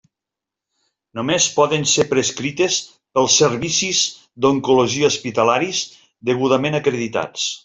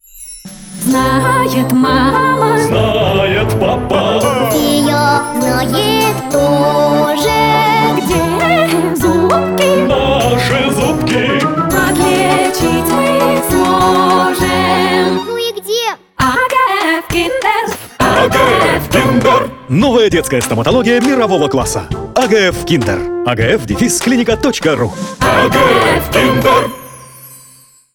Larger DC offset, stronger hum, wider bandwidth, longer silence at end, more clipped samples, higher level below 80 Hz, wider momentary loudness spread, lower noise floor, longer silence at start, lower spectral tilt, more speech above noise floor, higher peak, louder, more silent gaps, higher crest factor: neither; neither; second, 8.4 kHz vs 19.5 kHz; second, 0.05 s vs 0.6 s; neither; second, -58 dBFS vs -32 dBFS; about the same, 8 LU vs 6 LU; first, -86 dBFS vs -43 dBFS; first, 1.15 s vs 0.15 s; second, -3 dB/octave vs -4.5 dB/octave; first, 68 dB vs 32 dB; about the same, -2 dBFS vs 0 dBFS; second, -18 LUFS vs -12 LUFS; neither; about the same, 16 dB vs 12 dB